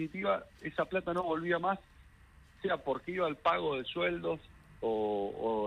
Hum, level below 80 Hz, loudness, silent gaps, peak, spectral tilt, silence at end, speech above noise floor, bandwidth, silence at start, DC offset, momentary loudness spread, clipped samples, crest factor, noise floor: none; -62 dBFS; -34 LUFS; none; -16 dBFS; -7 dB/octave; 0 s; 26 dB; 11.5 kHz; 0 s; under 0.1%; 7 LU; under 0.1%; 18 dB; -59 dBFS